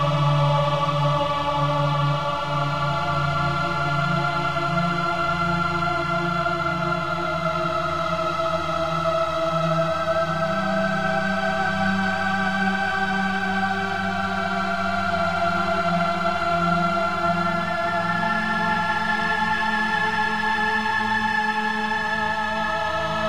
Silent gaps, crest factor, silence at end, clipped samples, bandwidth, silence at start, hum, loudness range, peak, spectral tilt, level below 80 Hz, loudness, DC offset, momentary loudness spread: none; 14 dB; 0 s; under 0.1%; 15 kHz; 0 s; none; 1 LU; -8 dBFS; -6 dB/octave; -48 dBFS; -22 LUFS; 1%; 3 LU